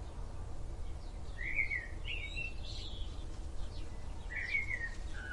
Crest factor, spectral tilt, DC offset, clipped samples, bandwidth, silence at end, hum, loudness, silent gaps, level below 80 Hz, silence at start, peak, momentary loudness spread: 18 dB; -4 dB/octave; under 0.1%; under 0.1%; 11 kHz; 0 s; none; -41 LUFS; none; -44 dBFS; 0 s; -22 dBFS; 13 LU